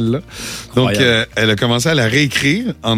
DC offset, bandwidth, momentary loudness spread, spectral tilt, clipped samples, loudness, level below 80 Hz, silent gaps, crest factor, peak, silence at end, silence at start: under 0.1%; 15.5 kHz; 8 LU; -4.5 dB/octave; under 0.1%; -14 LUFS; -42 dBFS; none; 14 dB; 0 dBFS; 0 s; 0 s